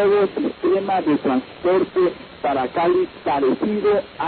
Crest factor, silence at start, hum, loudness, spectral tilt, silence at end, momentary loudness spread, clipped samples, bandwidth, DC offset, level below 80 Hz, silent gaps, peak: 10 dB; 0 s; none; -20 LUFS; -11 dB/octave; 0 s; 4 LU; under 0.1%; 4.5 kHz; under 0.1%; -54 dBFS; none; -8 dBFS